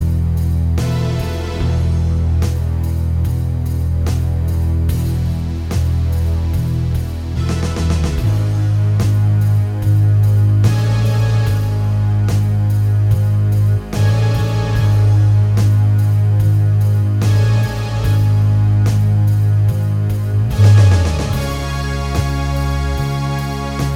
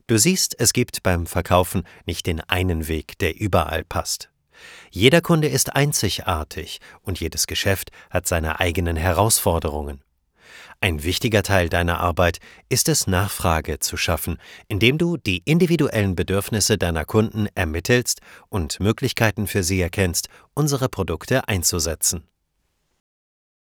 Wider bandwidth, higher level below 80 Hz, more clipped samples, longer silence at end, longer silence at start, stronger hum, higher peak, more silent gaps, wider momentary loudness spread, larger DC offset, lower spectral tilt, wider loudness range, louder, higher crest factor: second, 14 kHz vs over 20 kHz; first, -24 dBFS vs -38 dBFS; neither; second, 0 s vs 1.55 s; about the same, 0 s vs 0.1 s; neither; about the same, -2 dBFS vs 0 dBFS; neither; second, 6 LU vs 10 LU; neither; first, -7 dB/octave vs -4 dB/octave; about the same, 4 LU vs 3 LU; first, -16 LUFS vs -21 LUFS; second, 12 dB vs 22 dB